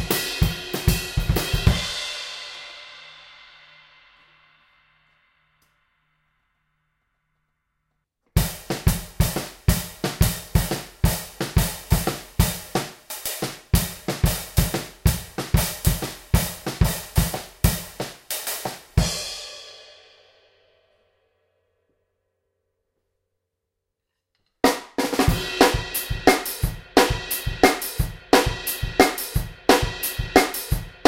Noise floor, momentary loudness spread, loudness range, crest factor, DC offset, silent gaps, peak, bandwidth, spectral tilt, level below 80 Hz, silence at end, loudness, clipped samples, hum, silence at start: -81 dBFS; 11 LU; 10 LU; 24 dB; under 0.1%; none; 0 dBFS; 17 kHz; -4.5 dB/octave; -32 dBFS; 0.15 s; -23 LUFS; under 0.1%; none; 0 s